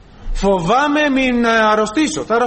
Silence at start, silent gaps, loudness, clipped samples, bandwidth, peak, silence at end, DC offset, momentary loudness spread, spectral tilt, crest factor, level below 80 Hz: 0.2 s; none; -15 LUFS; under 0.1%; 8.8 kHz; -4 dBFS; 0 s; under 0.1%; 5 LU; -4.5 dB/octave; 12 dB; -30 dBFS